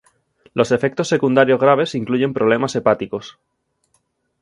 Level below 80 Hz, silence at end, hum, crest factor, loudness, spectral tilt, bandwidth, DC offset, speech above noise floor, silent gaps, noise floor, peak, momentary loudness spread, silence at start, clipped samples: -58 dBFS; 1.1 s; none; 18 dB; -17 LUFS; -6 dB/octave; 11.5 kHz; under 0.1%; 49 dB; none; -66 dBFS; 0 dBFS; 8 LU; 0.55 s; under 0.1%